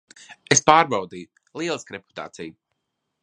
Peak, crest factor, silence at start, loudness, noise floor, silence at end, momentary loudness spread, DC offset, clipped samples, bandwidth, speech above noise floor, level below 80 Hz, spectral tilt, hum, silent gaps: 0 dBFS; 24 dB; 0.3 s; -20 LUFS; -78 dBFS; 0.7 s; 24 LU; under 0.1%; under 0.1%; 11 kHz; 56 dB; -64 dBFS; -2.5 dB/octave; none; none